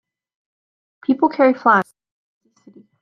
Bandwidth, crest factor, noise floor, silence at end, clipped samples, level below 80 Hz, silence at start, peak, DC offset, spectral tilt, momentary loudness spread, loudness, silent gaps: 9.8 kHz; 20 dB; -49 dBFS; 1.2 s; under 0.1%; -68 dBFS; 1.1 s; -2 dBFS; under 0.1%; -7 dB/octave; 13 LU; -17 LUFS; none